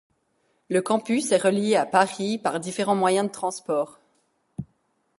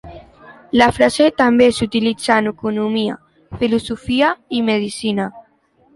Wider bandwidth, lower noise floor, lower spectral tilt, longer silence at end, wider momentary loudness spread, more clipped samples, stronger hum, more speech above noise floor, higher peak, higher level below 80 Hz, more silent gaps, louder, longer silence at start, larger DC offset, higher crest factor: about the same, 11.5 kHz vs 11.5 kHz; first, -70 dBFS vs -56 dBFS; about the same, -4.5 dB/octave vs -5 dB/octave; about the same, 0.55 s vs 0.55 s; first, 14 LU vs 10 LU; neither; neither; first, 47 dB vs 40 dB; second, -4 dBFS vs 0 dBFS; second, -66 dBFS vs -46 dBFS; neither; second, -24 LUFS vs -17 LUFS; first, 0.7 s vs 0.05 s; neither; about the same, 20 dB vs 16 dB